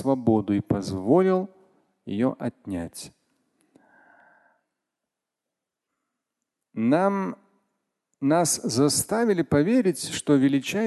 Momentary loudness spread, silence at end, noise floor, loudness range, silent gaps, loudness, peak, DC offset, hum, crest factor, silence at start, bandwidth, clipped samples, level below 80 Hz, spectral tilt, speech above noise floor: 15 LU; 0 s; -86 dBFS; 12 LU; none; -24 LUFS; -8 dBFS; under 0.1%; none; 18 dB; 0 s; 12.5 kHz; under 0.1%; -56 dBFS; -5 dB/octave; 63 dB